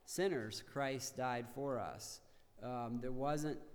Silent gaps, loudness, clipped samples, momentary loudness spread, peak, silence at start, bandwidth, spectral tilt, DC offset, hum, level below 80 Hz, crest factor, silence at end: none; -42 LUFS; under 0.1%; 10 LU; -26 dBFS; 0.05 s; over 20 kHz; -4.5 dB/octave; under 0.1%; none; -62 dBFS; 16 dB; 0 s